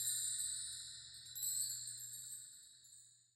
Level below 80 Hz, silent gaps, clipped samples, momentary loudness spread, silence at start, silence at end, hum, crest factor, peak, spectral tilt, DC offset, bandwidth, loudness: -82 dBFS; none; under 0.1%; 20 LU; 0 s; 0.2 s; none; 20 dB; -26 dBFS; 2.5 dB/octave; under 0.1%; 16 kHz; -42 LUFS